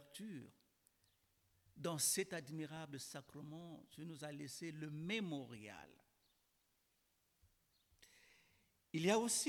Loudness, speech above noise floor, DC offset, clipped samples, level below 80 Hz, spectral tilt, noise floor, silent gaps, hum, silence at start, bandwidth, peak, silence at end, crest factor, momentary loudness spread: -44 LUFS; 38 dB; under 0.1%; under 0.1%; -84 dBFS; -3.5 dB/octave; -82 dBFS; none; none; 0 s; 19 kHz; -24 dBFS; 0 s; 24 dB; 18 LU